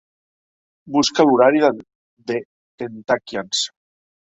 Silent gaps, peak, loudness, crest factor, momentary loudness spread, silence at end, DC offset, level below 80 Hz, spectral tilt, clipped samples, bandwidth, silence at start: 1.95-2.17 s, 2.45-2.78 s; -2 dBFS; -18 LUFS; 18 dB; 18 LU; 0.65 s; under 0.1%; -62 dBFS; -3.5 dB/octave; under 0.1%; 8.2 kHz; 0.85 s